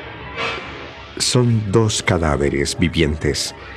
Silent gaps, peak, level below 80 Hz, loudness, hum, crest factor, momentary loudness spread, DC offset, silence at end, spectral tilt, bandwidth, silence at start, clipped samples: none; -2 dBFS; -34 dBFS; -18 LUFS; none; 16 dB; 13 LU; under 0.1%; 0 s; -4.5 dB/octave; 14.5 kHz; 0 s; under 0.1%